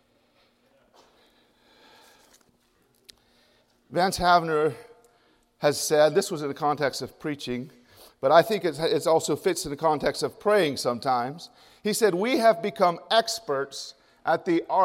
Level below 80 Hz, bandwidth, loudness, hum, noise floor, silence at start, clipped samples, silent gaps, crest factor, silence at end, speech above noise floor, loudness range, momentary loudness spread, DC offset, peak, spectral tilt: -58 dBFS; 16 kHz; -25 LUFS; none; -66 dBFS; 3.9 s; under 0.1%; none; 22 dB; 0 s; 42 dB; 4 LU; 13 LU; under 0.1%; -4 dBFS; -4 dB/octave